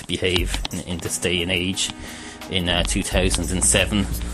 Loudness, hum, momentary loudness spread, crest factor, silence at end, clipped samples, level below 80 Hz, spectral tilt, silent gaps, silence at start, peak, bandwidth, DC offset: -21 LUFS; none; 11 LU; 20 dB; 0 s; under 0.1%; -30 dBFS; -3 dB/octave; none; 0 s; -2 dBFS; 15.5 kHz; under 0.1%